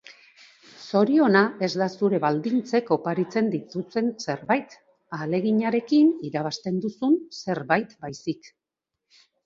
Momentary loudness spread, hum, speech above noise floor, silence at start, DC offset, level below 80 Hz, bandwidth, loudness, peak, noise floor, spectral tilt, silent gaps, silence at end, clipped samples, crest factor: 13 LU; none; 62 dB; 0.1 s; under 0.1%; -70 dBFS; 7.6 kHz; -24 LUFS; -4 dBFS; -86 dBFS; -6.5 dB/octave; none; 1.1 s; under 0.1%; 22 dB